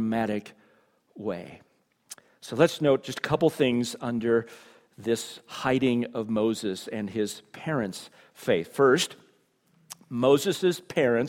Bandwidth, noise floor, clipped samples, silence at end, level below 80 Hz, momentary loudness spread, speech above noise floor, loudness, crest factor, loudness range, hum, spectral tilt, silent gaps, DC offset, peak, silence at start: 17.5 kHz; -66 dBFS; under 0.1%; 0 s; -64 dBFS; 18 LU; 40 dB; -27 LUFS; 22 dB; 3 LU; none; -5 dB/octave; none; under 0.1%; -6 dBFS; 0 s